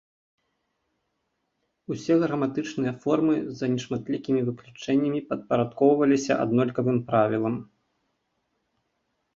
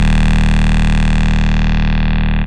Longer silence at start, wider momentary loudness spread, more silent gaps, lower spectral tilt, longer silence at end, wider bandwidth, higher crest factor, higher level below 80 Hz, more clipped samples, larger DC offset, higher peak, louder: first, 1.9 s vs 0 s; first, 8 LU vs 2 LU; neither; about the same, -7 dB/octave vs -6.5 dB/octave; first, 1.7 s vs 0 s; second, 7.6 kHz vs 9.4 kHz; first, 20 dB vs 8 dB; second, -66 dBFS vs -14 dBFS; neither; second, under 0.1% vs 10%; second, -8 dBFS vs -4 dBFS; second, -25 LUFS vs -15 LUFS